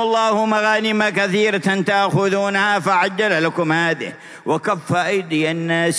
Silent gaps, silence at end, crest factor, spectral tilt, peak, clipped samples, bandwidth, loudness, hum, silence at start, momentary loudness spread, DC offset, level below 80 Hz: none; 0 s; 14 dB; -4.5 dB/octave; -2 dBFS; under 0.1%; 11 kHz; -18 LUFS; none; 0 s; 4 LU; under 0.1%; -72 dBFS